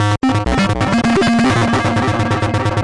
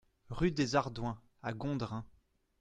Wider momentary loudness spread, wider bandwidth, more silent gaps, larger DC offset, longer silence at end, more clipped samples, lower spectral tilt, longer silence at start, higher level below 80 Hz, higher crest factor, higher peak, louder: second, 3 LU vs 13 LU; first, 11.5 kHz vs 9.6 kHz; neither; first, 0.7% vs under 0.1%; second, 0 s vs 0.55 s; neither; about the same, -6 dB/octave vs -6 dB/octave; second, 0 s vs 0.3 s; first, -32 dBFS vs -54 dBFS; second, 6 dB vs 20 dB; first, -8 dBFS vs -16 dBFS; first, -15 LUFS vs -36 LUFS